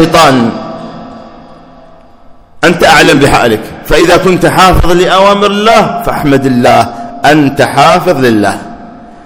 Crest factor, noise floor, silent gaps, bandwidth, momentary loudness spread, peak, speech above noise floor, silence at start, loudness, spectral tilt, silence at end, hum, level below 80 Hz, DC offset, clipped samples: 8 dB; -35 dBFS; none; over 20 kHz; 11 LU; 0 dBFS; 29 dB; 0 s; -6 LUFS; -5 dB/octave; 0.1 s; none; -24 dBFS; under 0.1%; 8%